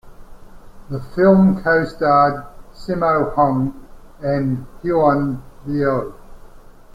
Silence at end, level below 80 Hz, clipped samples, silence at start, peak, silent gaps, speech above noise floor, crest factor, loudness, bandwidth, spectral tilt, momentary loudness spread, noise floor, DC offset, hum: 0.35 s; -40 dBFS; under 0.1%; 0.05 s; -2 dBFS; none; 24 dB; 16 dB; -18 LUFS; 7.6 kHz; -9 dB/octave; 16 LU; -40 dBFS; under 0.1%; none